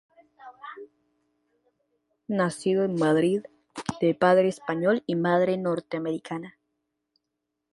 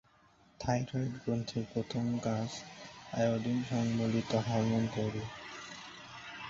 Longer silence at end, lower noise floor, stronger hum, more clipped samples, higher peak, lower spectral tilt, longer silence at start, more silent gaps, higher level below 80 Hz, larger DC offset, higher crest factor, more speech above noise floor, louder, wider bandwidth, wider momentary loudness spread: first, 1.25 s vs 0 s; first, -82 dBFS vs -65 dBFS; neither; neither; first, -8 dBFS vs -18 dBFS; about the same, -6.5 dB/octave vs -6 dB/octave; second, 0.45 s vs 0.6 s; neither; second, -68 dBFS vs -62 dBFS; neither; about the same, 20 dB vs 18 dB; first, 58 dB vs 32 dB; first, -25 LUFS vs -35 LUFS; first, 11.5 kHz vs 7.6 kHz; first, 21 LU vs 14 LU